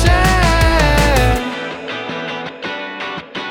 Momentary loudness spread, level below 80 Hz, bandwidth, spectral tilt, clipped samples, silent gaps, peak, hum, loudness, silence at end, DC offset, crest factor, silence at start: 12 LU; -20 dBFS; 17.5 kHz; -5 dB/octave; under 0.1%; none; 0 dBFS; none; -16 LUFS; 0 s; under 0.1%; 14 dB; 0 s